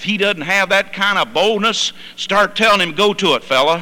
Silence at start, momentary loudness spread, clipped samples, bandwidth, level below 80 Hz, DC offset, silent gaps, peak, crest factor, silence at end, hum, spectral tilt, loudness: 0 s; 5 LU; under 0.1%; 19 kHz; -52 dBFS; under 0.1%; none; -4 dBFS; 12 dB; 0 s; none; -3 dB/octave; -15 LUFS